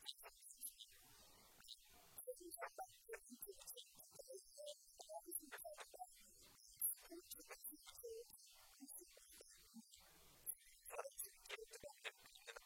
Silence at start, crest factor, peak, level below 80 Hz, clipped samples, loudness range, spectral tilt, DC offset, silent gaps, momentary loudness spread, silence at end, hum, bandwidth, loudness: 0 s; 26 dB; -30 dBFS; -82 dBFS; under 0.1%; 6 LU; -0.5 dB/octave; under 0.1%; none; 13 LU; 0 s; none; 16.5 kHz; -55 LUFS